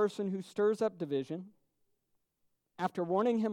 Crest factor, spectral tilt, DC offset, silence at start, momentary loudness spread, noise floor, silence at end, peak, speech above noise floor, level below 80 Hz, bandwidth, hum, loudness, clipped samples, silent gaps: 16 dB; -7 dB/octave; under 0.1%; 0 s; 8 LU; -80 dBFS; 0 s; -18 dBFS; 47 dB; -84 dBFS; 12 kHz; none; -34 LUFS; under 0.1%; none